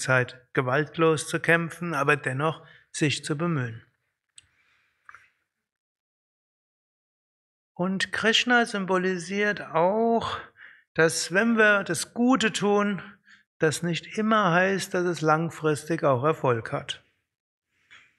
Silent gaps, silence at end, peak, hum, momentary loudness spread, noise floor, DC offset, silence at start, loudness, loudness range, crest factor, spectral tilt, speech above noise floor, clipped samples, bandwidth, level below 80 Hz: 5.78-7.75 s, 10.88-10.95 s, 13.46-13.60 s, 17.40-17.62 s; 0.25 s; -6 dBFS; none; 9 LU; -74 dBFS; under 0.1%; 0 s; -24 LUFS; 9 LU; 20 dB; -4.5 dB/octave; 49 dB; under 0.1%; 13 kHz; -68 dBFS